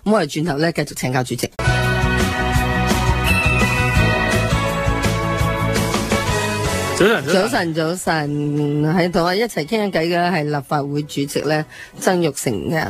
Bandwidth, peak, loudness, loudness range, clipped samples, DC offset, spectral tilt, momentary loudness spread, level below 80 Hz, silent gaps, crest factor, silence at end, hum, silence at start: 15.5 kHz; -2 dBFS; -18 LUFS; 2 LU; under 0.1%; under 0.1%; -5 dB/octave; 5 LU; -30 dBFS; none; 16 dB; 0 s; none; 0.05 s